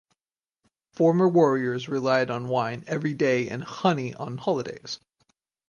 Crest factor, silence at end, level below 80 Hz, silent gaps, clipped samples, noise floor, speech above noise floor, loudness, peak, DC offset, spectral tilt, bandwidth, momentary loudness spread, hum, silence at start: 18 dB; 0.7 s; -68 dBFS; none; under 0.1%; under -90 dBFS; over 66 dB; -25 LUFS; -8 dBFS; under 0.1%; -6.5 dB/octave; 9.8 kHz; 13 LU; none; 1 s